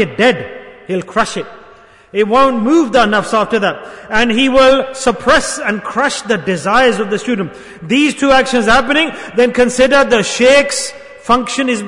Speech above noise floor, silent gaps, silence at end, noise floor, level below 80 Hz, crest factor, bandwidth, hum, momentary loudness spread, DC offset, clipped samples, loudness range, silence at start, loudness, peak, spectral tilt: 29 dB; none; 0 s; -41 dBFS; -38 dBFS; 12 dB; 11 kHz; none; 12 LU; under 0.1%; under 0.1%; 3 LU; 0 s; -12 LUFS; 0 dBFS; -3.5 dB/octave